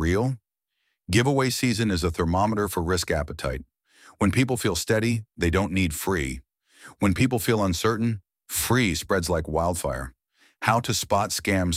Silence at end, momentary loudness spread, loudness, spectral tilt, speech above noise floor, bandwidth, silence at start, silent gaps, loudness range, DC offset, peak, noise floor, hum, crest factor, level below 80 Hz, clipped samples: 0 s; 8 LU; -24 LUFS; -5 dB/octave; 53 dB; 16 kHz; 0 s; none; 1 LU; under 0.1%; -4 dBFS; -77 dBFS; none; 20 dB; -40 dBFS; under 0.1%